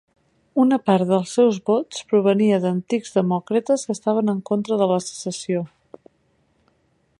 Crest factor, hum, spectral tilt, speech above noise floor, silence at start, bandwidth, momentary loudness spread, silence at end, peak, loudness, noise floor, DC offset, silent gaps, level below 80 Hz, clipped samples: 18 dB; none; -6 dB/octave; 45 dB; 0.55 s; 11.5 kHz; 8 LU; 1.5 s; -4 dBFS; -21 LUFS; -65 dBFS; under 0.1%; none; -68 dBFS; under 0.1%